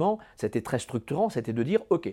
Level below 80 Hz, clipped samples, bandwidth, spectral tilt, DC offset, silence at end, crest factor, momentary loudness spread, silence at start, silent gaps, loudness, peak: -62 dBFS; under 0.1%; 16 kHz; -6.5 dB/octave; under 0.1%; 0 s; 18 dB; 6 LU; 0 s; none; -29 LUFS; -10 dBFS